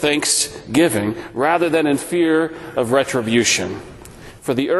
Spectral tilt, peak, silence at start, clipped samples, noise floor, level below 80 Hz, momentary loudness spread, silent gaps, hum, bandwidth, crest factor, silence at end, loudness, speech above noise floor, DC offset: -3.5 dB/octave; -2 dBFS; 0 s; under 0.1%; -39 dBFS; -50 dBFS; 9 LU; none; none; 12.5 kHz; 16 dB; 0 s; -18 LUFS; 21 dB; under 0.1%